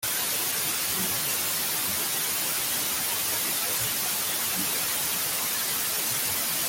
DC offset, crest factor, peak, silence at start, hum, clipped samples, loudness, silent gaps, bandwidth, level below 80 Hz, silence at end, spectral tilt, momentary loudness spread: under 0.1%; 14 dB; -14 dBFS; 0 s; none; under 0.1%; -25 LUFS; none; 17 kHz; -62 dBFS; 0 s; 0 dB/octave; 0 LU